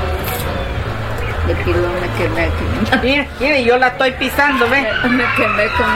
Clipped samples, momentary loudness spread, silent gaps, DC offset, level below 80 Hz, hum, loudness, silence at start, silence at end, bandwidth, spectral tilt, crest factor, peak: under 0.1%; 8 LU; none; under 0.1%; -28 dBFS; none; -15 LUFS; 0 s; 0 s; 16.5 kHz; -5.5 dB/octave; 14 dB; 0 dBFS